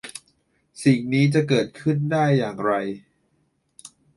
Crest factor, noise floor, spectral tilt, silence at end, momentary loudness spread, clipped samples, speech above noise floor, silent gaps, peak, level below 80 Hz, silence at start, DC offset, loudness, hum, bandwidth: 18 dB; -68 dBFS; -6.5 dB/octave; 0.3 s; 15 LU; under 0.1%; 48 dB; none; -6 dBFS; -62 dBFS; 0.05 s; under 0.1%; -22 LUFS; none; 11.5 kHz